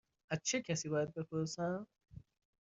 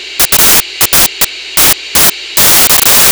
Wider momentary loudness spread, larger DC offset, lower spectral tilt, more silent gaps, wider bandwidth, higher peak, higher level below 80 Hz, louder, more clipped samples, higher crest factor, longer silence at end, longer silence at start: first, 22 LU vs 5 LU; neither; first, -5 dB/octave vs 0 dB/octave; neither; second, 8 kHz vs over 20 kHz; second, -22 dBFS vs 0 dBFS; second, -72 dBFS vs -32 dBFS; second, -39 LUFS vs -5 LUFS; neither; first, 20 dB vs 8 dB; first, 0.5 s vs 0 s; first, 0.3 s vs 0 s